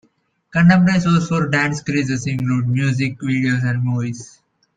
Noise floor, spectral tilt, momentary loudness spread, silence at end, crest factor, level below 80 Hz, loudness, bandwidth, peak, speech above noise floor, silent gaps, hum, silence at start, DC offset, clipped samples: -59 dBFS; -6.5 dB/octave; 8 LU; 0.5 s; 16 dB; -52 dBFS; -18 LUFS; 9.2 kHz; -2 dBFS; 42 dB; none; none; 0.55 s; under 0.1%; under 0.1%